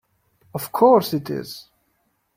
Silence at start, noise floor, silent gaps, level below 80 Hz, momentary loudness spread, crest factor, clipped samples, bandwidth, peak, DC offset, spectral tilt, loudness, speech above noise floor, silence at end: 0.55 s; -69 dBFS; none; -64 dBFS; 20 LU; 20 dB; under 0.1%; 16.5 kHz; -2 dBFS; under 0.1%; -6 dB/octave; -19 LUFS; 50 dB; 0.75 s